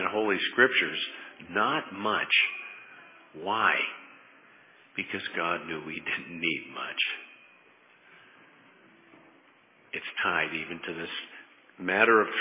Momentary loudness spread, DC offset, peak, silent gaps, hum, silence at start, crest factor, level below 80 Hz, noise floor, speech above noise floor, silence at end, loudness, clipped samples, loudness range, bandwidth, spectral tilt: 17 LU; under 0.1%; -6 dBFS; none; none; 0 s; 24 dB; -72 dBFS; -60 dBFS; 32 dB; 0 s; -28 LUFS; under 0.1%; 9 LU; 3.9 kHz; -0.5 dB/octave